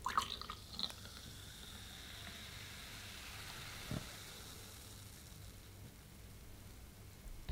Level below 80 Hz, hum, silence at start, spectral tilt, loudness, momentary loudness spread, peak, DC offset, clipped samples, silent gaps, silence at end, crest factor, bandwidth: -60 dBFS; none; 0 s; -3 dB/octave; -49 LUFS; 13 LU; -20 dBFS; under 0.1%; under 0.1%; none; 0 s; 28 dB; 17 kHz